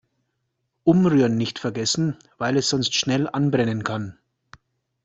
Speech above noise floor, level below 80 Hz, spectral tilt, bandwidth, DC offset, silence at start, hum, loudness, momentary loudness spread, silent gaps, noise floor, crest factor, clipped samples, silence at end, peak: 54 dB; -58 dBFS; -5 dB/octave; 8.2 kHz; under 0.1%; 0.85 s; none; -22 LUFS; 10 LU; none; -75 dBFS; 20 dB; under 0.1%; 0.9 s; -4 dBFS